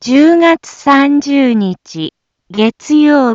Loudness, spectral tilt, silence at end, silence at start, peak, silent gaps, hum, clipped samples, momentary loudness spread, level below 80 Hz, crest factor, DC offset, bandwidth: -10 LUFS; -5.5 dB/octave; 0 s; 0 s; 0 dBFS; none; none; under 0.1%; 15 LU; -56 dBFS; 10 dB; under 0.1%; 7.6 kHz